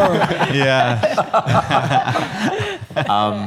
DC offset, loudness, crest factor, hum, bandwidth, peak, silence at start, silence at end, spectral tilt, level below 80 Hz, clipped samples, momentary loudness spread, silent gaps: under 0.1%; -17 LUFS; 14 dB; none; 15 kHz; -2 dBFS; 0 s; 0 s; -5.5 dB/octave; -48 dBFS; under 0.1%; 6 LU; none